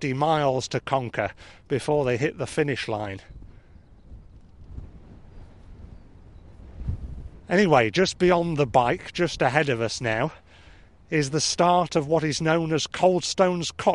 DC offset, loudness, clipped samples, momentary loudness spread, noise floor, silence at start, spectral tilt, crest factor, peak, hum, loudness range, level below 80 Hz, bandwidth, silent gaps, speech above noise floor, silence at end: 0.1%; -24 LUFS; under 0.1%; 15 LU; -51 dBFS; 0 s; -5 dB/octave; 20 dB; -4 dBFS; none; 14 LU; -46 dBFS; 11.5 kHz; none; 28 dB; 0 s